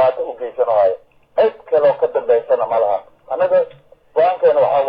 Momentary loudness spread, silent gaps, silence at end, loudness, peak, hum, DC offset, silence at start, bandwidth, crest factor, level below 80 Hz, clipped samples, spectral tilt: 11 LU; none; 0 s; -17 LUFS; -4 dBFS; none; under 0.1%; 0 s; 5 kHz; 12 dB; -62 dBFS; under 0.1%; -8 dB/octave